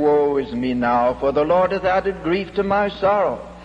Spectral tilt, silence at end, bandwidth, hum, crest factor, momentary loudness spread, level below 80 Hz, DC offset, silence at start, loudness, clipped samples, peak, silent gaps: -7.5 dB/octave; 0 s; 8 kHz; none; 12 dB; 5 LU; -44 dBFS; under 0.1%; 0 s; -19 LUFS; under 0.1%; -8 dBFS; none